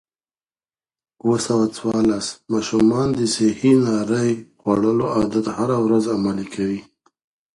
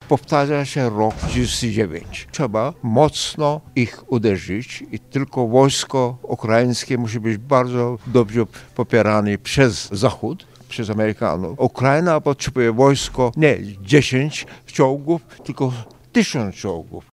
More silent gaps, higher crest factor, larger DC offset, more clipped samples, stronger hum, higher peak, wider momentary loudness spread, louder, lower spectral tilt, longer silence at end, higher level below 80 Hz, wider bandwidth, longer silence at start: neither; about the same, 16 dB vs 18 dB; neither; neither; neither; second, -4 dBFS vs 0 dBFS; second, 8 LU vs 11 LU; about the same, -20 LUFS vs -19 LUFS; about the same, -6 dB/octave vs -5.5 dB/octave; first, 0.7 s vs 0.1 s; second, -52 dBFS vs -42 dBFS; second, 11.5 kHz vs 15 kHz; first, 1.25 s vs 0 s